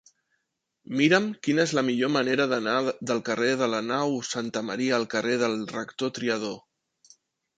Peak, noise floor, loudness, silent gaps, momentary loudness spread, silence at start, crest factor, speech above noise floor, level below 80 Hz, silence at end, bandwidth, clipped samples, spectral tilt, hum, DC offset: -6 dBFS; -78 dBFS; -26 LUFS; none; 8 LU; 0.9 s; 22 dB; 52 dB; -72 dBFS; 1 s; 9.4 kHz; under 0.1%; -4.5 dB/octave; none; under 0.1%